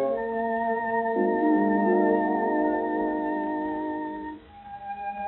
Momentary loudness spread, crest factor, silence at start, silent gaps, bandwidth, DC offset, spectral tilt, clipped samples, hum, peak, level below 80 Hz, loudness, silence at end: 15 LU; 14 dB; 0 s; none; 4.1 kHz; under 0.1%; -6.5 dB/octave; under 0.1%; none; -12 dBFS; -60 dBFS; -26 LUFS; 0 s